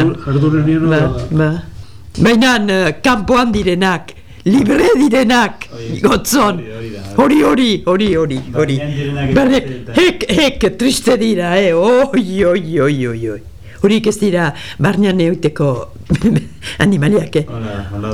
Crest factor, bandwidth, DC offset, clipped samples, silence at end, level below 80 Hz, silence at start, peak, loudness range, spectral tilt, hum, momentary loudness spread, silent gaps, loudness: 14 dB; 16.5 kHz; 2%; under 0.1%; 0 s; -34 dBFS; 0 s; 0 dBFS; 2 LU; -5.5 dB/octave; none; 11 LU; none; -13 LUFS